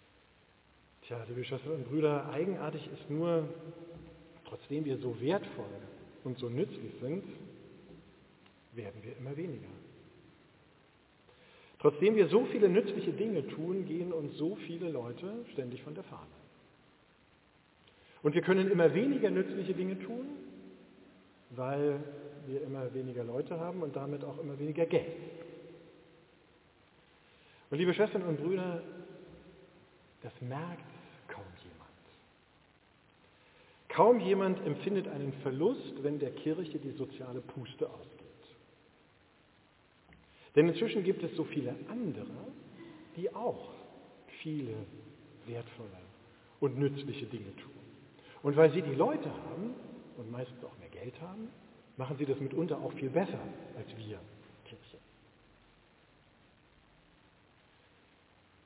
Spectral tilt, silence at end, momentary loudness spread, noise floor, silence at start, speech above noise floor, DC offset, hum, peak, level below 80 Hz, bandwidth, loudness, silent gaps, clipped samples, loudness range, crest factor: -6.5 dB/octave; 3.7 s; 25 LU; -66 dBFS; 1.05 s; 32 dB; under 0.1%; none; -10 dBFS; -74 dBFS; 4 kHz; -34 LUFS; none; under 0.1%; 15 LU; 26 dB